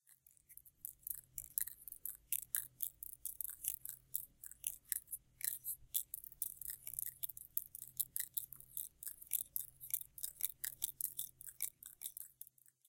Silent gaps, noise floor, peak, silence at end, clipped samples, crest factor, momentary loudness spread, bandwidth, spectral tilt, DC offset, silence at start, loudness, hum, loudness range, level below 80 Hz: none; -69 dBFS; -12 dBFS; 0.45 s; under 0.1%; 36 dB; 9 LU; 17 kHz; 1.5 dB/octave; under 0.1%; 0.1 s; -43 LUFS; none; 1 LU; -76 dBFS